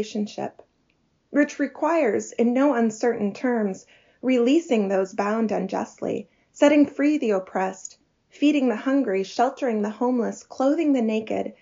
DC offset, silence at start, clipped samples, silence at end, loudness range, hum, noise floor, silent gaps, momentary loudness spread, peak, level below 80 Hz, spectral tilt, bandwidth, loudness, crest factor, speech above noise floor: under 0.1%; 0 s; under 0.1%; 0.1 s; 2 LU; none; -67 dBFS; none; 10 LU; -6 dBFS; -74 dBFS; -5 dB/octave; 7.4 kHz; -23 LUFS; 18 dB; 45 dB